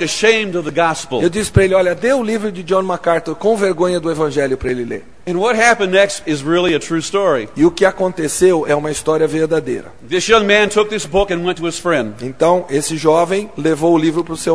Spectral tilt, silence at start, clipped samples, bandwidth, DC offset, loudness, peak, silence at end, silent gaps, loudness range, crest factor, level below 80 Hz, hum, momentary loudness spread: -4.5 dB/octave; 0 s; under 0.1%; 11 kHz; 1%; -15 LUFS; 0 dBFS; 0 s; none; 2 LU; 16 dB; -40 dBFS; none; 7 LU